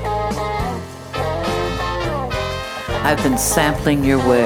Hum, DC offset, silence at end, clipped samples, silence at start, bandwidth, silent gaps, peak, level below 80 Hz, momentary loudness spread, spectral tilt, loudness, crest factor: none; under 0.1%; 0 s; under 0.1%; 0 s; 19.5 kHz; none; 0 dBFS; -32 dBFS; 9 LU; -4.5 dB/octave; -19 LUFS; 18 dB